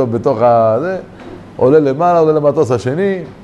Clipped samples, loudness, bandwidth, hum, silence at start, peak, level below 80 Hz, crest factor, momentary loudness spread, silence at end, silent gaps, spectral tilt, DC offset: under 0.1%; -13 LUFS; 9.8 kHz; none; 0 s; 0 dBFS; -48 dBFS; 12 dB; 14 LU; 0 s; none; -8 dB/octave; under 0.1%